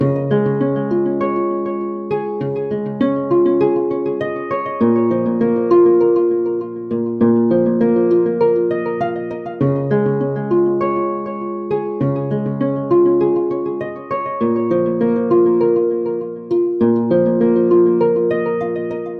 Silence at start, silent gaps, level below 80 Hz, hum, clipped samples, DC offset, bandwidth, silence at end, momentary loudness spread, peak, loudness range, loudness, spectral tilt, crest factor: 0 s; none; -58 dBFS; none; under 0.1%; under 0.1%; 4.5 kHz; 0 s; 9 LU; -4 dBFS; 4 LU; -17 LUFS; -11 dB/octave; 12 dB